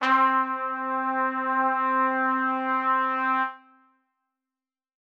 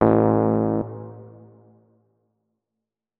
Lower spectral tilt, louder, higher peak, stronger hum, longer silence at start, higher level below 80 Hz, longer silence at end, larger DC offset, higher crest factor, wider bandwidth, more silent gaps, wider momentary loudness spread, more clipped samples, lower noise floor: second, -3.5 dB/octave vs -13 dB/octave; second, -24 LUFS vs -21 LUFS; second, -10 dBFS vs 0 dBFS; neither; about the same, 0 s vs 0 s; second, -86 dBFS vs -52 dBFS; second, 1.45 s vs 1.9 s; neither; second, 16 dB vs 24 dB; first, 7.2 kHz vs 3.6 kHz; neither; second, 6 LU vs 22 LU; neither; first, under -90 dBFS vs -85 dBFS